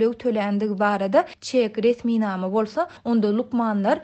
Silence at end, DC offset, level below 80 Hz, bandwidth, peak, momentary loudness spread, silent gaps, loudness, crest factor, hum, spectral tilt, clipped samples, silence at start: 0 s; under 0.1%; -64 dBFS; 8.6 kHz; -6 dBFS; 3 LU; none; -22 LUFS; 16 dB; none; -6.5 dB/octave; under 0.1%; 0 s